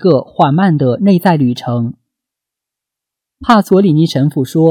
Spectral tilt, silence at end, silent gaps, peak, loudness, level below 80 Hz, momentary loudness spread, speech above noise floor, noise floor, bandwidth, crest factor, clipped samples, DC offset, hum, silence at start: -8 dB/octave; 0 s; none; 0 dBFS; -12 LUFS; -48 dBFS; 8 LU; 72 dB; -82 dBFS; 18 kHz; 12 dB; under 0.1%; under 0.1%; none; 0 s